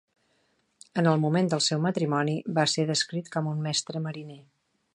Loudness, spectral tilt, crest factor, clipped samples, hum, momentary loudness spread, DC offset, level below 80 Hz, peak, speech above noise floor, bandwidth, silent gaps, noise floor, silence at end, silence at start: -27 LUFS; -4.5 dB/octave; 20 dB; under 0.1%; none; 10 LU; under 0.1%; -74 dBFS; -8 dBFS; 44 dB; 11 kHz; none; -70 dBFS; 0.55 s; 0.95 s